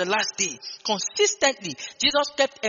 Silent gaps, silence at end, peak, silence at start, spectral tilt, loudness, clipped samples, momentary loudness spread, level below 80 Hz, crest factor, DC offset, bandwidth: none; 0 s; -4 dBFS; 0 s; 0 dB/octave; -23 LUFS; under 0.1%; 10 LU; -62 dBFS; 20 dB; under 0.1%; 7.4 kHz